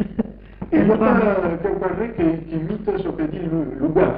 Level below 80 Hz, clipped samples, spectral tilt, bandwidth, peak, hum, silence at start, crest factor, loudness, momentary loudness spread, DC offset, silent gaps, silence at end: -40 dBFS; under 0.1%; -12.5 dB/octave; 4.9 kHz; -4 dBFS; none; 0 s; 16 dB; -21 LUFS; 10 LU; under 0.1%; none; 0 s